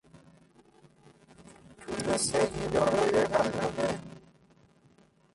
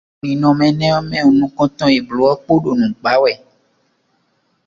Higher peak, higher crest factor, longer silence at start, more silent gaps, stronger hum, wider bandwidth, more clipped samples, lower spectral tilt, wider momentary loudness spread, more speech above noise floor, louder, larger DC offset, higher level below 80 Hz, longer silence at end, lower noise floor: second, -14 dBFS vs 0 dBFS; about the same, 18 dB vs 16 dB; about the same, 0.15 s vs 0.25 s; neither; neither; first, 11.5 kHz vs 7.6 kHz; neither; second, -4 dB/octave vs -7 dB/octave; first, 13 LU vs 4 LU; second, 35 dB vs 49 dB; second, -29 LUFS vs -15 LUFS; neither; second, -56 dBFS vs -50 dBFS; second, 1.15 s vs 1.3 s; about the same, -62 dBFS vs -63 dBFS